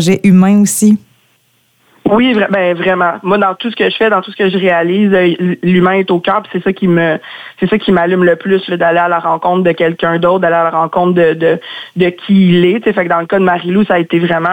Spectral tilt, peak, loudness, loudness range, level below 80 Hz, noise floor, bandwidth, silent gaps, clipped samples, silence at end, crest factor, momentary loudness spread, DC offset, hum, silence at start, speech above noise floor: -6 dB/octave; 0 dBFS; -11 LUFS; 1 LU; -50 dBFS; -55 dBFS; 16.5 kHz; none; under 0.1%; 0 s; 10 dB; 6 LU; under 0.1%; none; 0 s; 44 dB